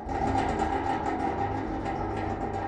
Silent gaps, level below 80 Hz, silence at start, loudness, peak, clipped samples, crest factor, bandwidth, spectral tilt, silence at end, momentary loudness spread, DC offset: none; -42 dBFS; 0 s; -30 LUFS; -16 dBFS; under 0.1%; 14 dB; 9.8 kHz; -7 dB/octave; 0 s; 4 LU; under 0.1%